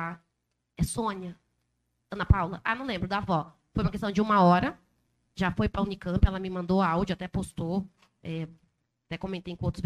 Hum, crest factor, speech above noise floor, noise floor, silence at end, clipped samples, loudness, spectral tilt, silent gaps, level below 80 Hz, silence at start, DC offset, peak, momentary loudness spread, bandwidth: none; 24 dB; 52 dB; -79 dBFS; 0 s; under 0.1%; -29 LUFS; -6.5 dB/octave; none; -40 dBFS; 0 s; under 0.1%; -6 dBFS; 15 LU; 13 kHz